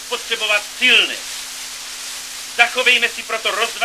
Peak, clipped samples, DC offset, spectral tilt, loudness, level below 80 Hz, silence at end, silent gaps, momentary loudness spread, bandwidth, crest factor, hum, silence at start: 0 dBFS; under 0.1%; 0.1%; 1.5 dB/octave; -16 LUFS; -60 dBFS; 0 s; none; 15 LU; 16 kHz; 20 dB; none; 0 s